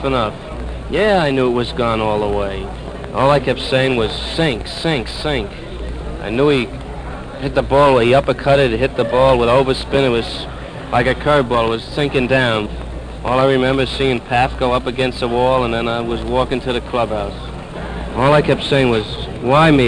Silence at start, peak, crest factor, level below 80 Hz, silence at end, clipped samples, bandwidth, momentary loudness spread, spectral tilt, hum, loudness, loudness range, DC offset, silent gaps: 0 s; 0 dBFS; 16 dB; -30 dBFS; 0 s; under 0.1%; 10 kHz; 14 LU; -6 dB/octave; none; -16 LUFS; 4 LU; under 0.1%; none